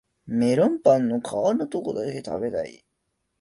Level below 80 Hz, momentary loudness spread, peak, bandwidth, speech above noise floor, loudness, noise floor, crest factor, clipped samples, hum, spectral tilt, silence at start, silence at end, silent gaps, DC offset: -62 dBFS; 10 LU; -6 dBFS; 11.5 kHz; 53 dB; -24 LUFS; -76 dBFS; 18 dB; under 0.1%; none; -7 dB/octave; 0.25 s; 0.65 s; none; under 0.1%